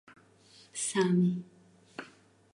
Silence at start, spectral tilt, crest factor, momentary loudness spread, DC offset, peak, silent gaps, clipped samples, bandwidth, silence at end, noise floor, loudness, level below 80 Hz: 0.75 s; -5.5 dB/octave; 18 dB; 21 LU; under 0.1%; -14 dBFS; none; under 0.1%; 11.5 kHz; 0.5 s; -60 dBFS; -30 LUFS; -78 dBFS